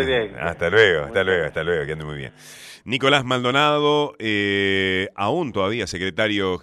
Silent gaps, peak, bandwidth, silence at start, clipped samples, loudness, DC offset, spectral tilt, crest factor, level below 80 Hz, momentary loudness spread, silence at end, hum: none; -2 dBFS; 12.5 kHz; 0 s; under 0.1%; -20 LUFS; under 0.1%; -5 dB/octave; 20 dB; -48 dBFS; 13 LU; 0.05 s; none